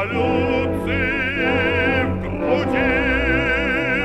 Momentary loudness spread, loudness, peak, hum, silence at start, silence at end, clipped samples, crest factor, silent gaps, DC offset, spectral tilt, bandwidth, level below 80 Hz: 3 LU; -19 LUFS; -6 dBFS; none; 0 s; 0 s; under 0.1%; 14 dB; none; under 0.1%; -7 dB/octave; 13 kHz; -34 dBFS